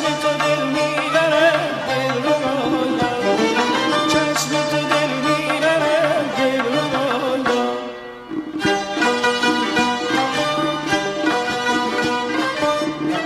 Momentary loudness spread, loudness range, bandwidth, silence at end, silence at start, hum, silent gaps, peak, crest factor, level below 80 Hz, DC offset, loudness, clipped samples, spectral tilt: 4 LU; 2 LU; 15.5 kHz; 0 s; 0 s; none; none; -4 dBFS; 16 dB; -54 dBFS; under 0.1%; -18 LUFS; under 0.1%; -4 dB/octave